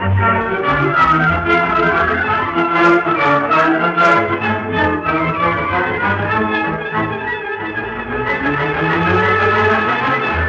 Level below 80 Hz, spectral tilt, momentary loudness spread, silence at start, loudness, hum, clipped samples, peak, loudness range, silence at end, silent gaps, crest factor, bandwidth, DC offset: -40 dBFS; -7 dB/octave; 7 LU; 0 s; -15 LUFS; none; under 0.1%; -2 dBFS; 5 LU; 0 s; none; 14 dB; 8 kHz; under 0.1%